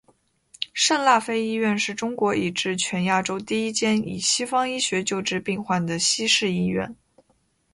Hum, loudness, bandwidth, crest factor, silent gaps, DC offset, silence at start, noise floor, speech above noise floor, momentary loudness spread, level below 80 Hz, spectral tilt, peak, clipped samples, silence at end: none; -23 LUFS; 11.5 kHz; 20 dB; none; under 0.1%; 0.6 s; -66 dBFS; 43 dB; 7 LU; -60 dBFS; -3 dB/octave; -4 dBFS; under 0.1%; 0.8 s